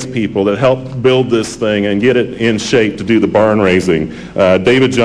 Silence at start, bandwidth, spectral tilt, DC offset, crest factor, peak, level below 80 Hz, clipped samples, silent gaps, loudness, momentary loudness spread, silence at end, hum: 0 s; 11 kHz; -5.5 dB/octave; 0.4%; 10 dB; -2 dBFS; -42 dBFS; under 0.1%; none; -12 LUFS; 5 LU; 0 s; none